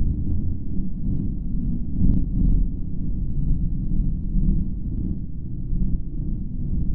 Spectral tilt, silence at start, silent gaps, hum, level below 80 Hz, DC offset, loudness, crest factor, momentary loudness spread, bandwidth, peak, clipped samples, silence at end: -14.5 dB/octave; 0 s; none; none; -24 dBFS; 3%; -27 LUFS; 16 dB; 7 LU; 1 kHz; -4 dBFS; under 0.1%; 0 s